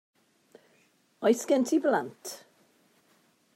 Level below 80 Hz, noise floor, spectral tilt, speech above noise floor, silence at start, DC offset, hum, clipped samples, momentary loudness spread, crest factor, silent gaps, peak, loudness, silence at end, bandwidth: -90 dBFS; -67 dBFS; -4 dB/octave; 40 dB; 1.2 s; under 0.1%; none; under 0.1%; 17 LU; 20 dB; none; -12 dBFS; -27 LUFS; 1.2 s; 16 kHz